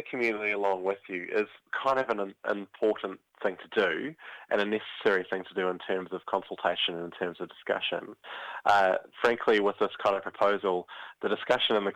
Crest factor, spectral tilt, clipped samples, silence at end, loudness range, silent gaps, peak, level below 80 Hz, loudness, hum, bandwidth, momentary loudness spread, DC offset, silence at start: 22 dB; -4.5 dB/octave; under 0.1%; 0 s; 4 LU; none; -8 dBFS; -72 dBFS; -29 LUFS; none; 10 kHz; 10 LU; under 0.1%; 0 s